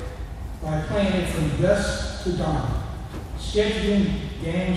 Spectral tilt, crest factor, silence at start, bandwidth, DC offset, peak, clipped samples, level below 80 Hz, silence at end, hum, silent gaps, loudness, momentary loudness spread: -6 dB/octave; 18 dB; 0 s; 14 kHz; under 0.1%; -6 dBFS; under 0.1%; -32 dBFS; 0 s; none; none; -25 LUFS; 13 LU